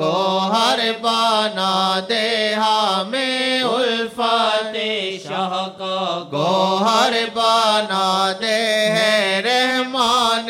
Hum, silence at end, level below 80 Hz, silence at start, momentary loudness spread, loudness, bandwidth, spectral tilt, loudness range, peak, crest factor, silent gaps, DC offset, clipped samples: none; 0 s; -64 dBFS; 0 s; 7 LU; -18 LUFS; 17 kHz; -3 dB/octave; 3 LU; -2 dBFS; 16 dB; none; under 0.1%; under 0.1%